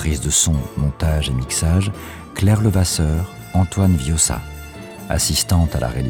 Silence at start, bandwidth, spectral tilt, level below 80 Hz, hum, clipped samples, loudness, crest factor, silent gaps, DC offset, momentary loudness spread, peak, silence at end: 0 s; 18.5 kHz; -4.5 dB/octave; -30 dBFS; none; under 0.1%; -18 LUFS; 14 dB; none; under 0.1%; 13 LU; -4 dBFS; 0 s